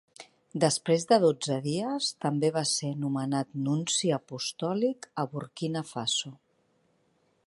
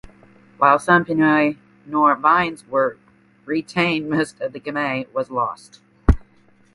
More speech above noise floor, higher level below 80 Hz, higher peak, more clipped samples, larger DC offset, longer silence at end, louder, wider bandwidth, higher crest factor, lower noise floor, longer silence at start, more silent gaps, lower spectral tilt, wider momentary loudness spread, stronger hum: first, 42 dB vs 35 dB; second, -76 dBFS vs -32 dBFS; second, -8 dBFS vs 0 dBFS; neither; neither; first, 1.1 s vs 0.55 s; second, -29 LUFS vs -20 LUFS; about the same, 11.5 kHz vs 11.5 kHz; about the same, 20 dB vs 20 dB; first, -70 dBFS vs -55 dBFS; second, 0.2 s vs 0.6 s; neither; second, -4.5 dB/octave vs -6.5 dB/octave; about the same, 10 LU vs 11 LU; neither